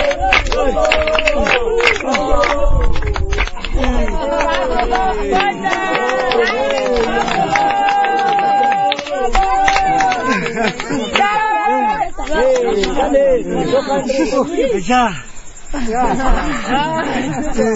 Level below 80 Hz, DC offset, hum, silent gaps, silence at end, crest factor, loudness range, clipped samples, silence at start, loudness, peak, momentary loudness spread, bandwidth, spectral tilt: -24 dBFS; under 0.1%; none; none; 0 s; 14 dB; 3 LU; under 0.1%; 0 s; -15 LUFS; 0 dBFS; 6 LU; 8 kHz; -4.5 dB/octave